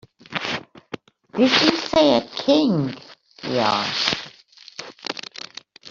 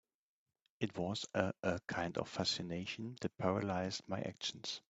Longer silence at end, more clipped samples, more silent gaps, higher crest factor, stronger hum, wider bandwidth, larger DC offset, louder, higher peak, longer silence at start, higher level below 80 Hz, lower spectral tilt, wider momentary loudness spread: second, 0 s vs 0.15 s; neither; neither; about the same, 20 dB vs 24 dB; neither; about the same, 7.6 kHz vs 8.2 kHz; neither; first, -20 LUFS vs -40 LUFS; first, -2 dBFS vs -16 dBFS; second, 0.3 s vs 0.8 s; first, -58 dBFS vs -72 dBFS; about the same, -4.5 dB/octave vs -4.5 dB/octave; first, 21 LU vs 6 LU